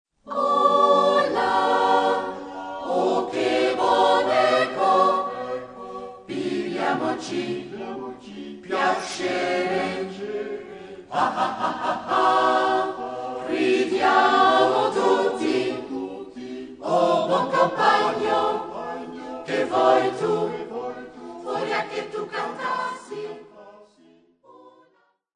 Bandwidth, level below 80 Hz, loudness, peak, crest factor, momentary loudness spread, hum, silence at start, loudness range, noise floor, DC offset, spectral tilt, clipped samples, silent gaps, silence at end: 10.5 kHz; -66 dBFS; -22 LUFS; -4 dBFS; 18 dB; 16 LU; none; 0.25 s; 8 LU; -64 dBFS; under 0.1%; -4.5 dB/octave; under 0.1%; none; 0.65 s